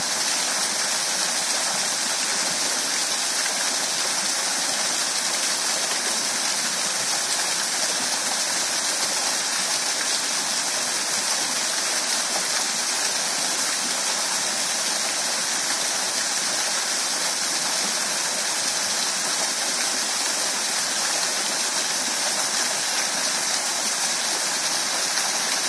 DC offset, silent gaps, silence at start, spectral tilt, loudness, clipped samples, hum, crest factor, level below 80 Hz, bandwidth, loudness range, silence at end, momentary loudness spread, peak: under 0.1%; none; 0 s; 1 dB/octave; -21 LUFS; under 0.1%; none; 18 dB; -82 dBFS; 11 kHz; 0 LU; 0 s; 1 LU; -6 dBFS